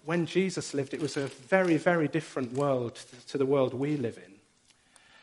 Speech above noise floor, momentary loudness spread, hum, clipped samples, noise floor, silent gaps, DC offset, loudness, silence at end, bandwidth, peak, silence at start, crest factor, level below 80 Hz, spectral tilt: 36 dB; 10 LU; none; under 0.1%; -65 dBFS; none; under 0.1%; -29 LUFS; 0.9 s; 11.5 kHz; -8 dBFS; 0.05 s; 22 dB; -74 dBFS; -6 dB/octave